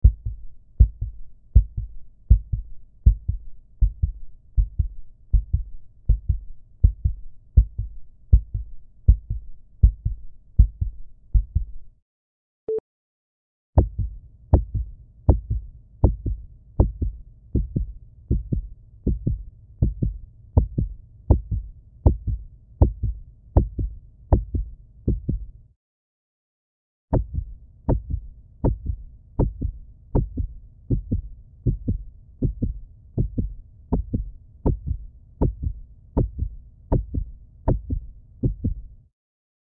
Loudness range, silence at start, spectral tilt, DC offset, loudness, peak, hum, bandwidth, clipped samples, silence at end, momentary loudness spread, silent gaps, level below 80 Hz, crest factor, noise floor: 5 LU; 0.05 s; -15 dB/octave; under 0.1%; -26 LUFS; -2 dBFS; none; 1.7 kHz; under 0.1%; 0.85 s; 16 LU; 12.02-12.67 s, 12.80-13.73 s, 25.76-27.08 s; -26 dBFS; 22 dB; under -90 dBFS